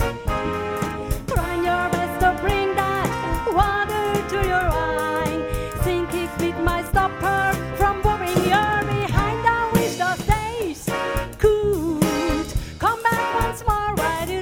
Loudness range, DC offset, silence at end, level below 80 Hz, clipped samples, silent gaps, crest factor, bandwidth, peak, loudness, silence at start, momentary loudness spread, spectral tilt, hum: 2 LU; under 0.1%; 0 s; -32 dBFS; under 0.1%; none; 18 dB; 17.5 kHz; -4 dBFS; -22 LUFS; 0 s; 6 LU; -5.5 dB/octave; none